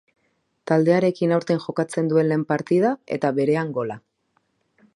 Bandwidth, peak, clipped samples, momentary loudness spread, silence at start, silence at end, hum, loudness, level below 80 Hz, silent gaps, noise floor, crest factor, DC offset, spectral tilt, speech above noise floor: 11 kHz; -4 dBFS; under 0.1%; 9 LU; 0.65 s; 0.95 s; none; -22 LUFS; -68 dBFS; none; -70 dBFS; 18 dB; under 0.1%; -7.5 dB/octave; 49 dB